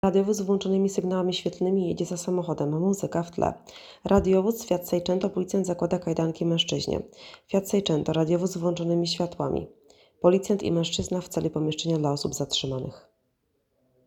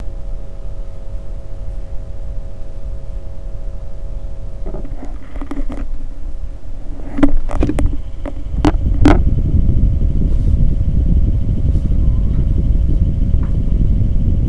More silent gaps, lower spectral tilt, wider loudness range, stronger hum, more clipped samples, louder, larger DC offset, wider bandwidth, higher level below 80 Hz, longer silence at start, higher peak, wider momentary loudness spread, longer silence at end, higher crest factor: neither; second, -5.5 dB/octave vs -8.5 dB/octave; second, 2 LU vs 15 LU; neither; neither; second, -26 LUFS vs -18 LUFS; second, under 0.1% vs 6%; first, 16.5 kHz vs 6 kHz; second, -52 dBFS vs -16 dBFS; about the same, 0.05 s vs 0 s; second, -6 dBFS vs 0 dBFS; second, 6 LU vs 15 LU; first, 1.05 s vs 0 s; about the same, 20 dB vs 16 dB